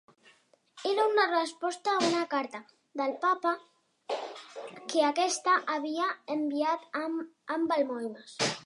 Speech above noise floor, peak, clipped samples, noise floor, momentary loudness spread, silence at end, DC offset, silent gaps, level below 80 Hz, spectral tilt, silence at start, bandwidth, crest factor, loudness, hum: 34 dB; -14 dBFS; under 0.1%; -64 dBFS; 12 LU; 0 s; under 0.1%; none; -86 dBFS; -3 dB/octave; 0.75 s; 11.5 kHz; 18 dB; -30 LUFS; none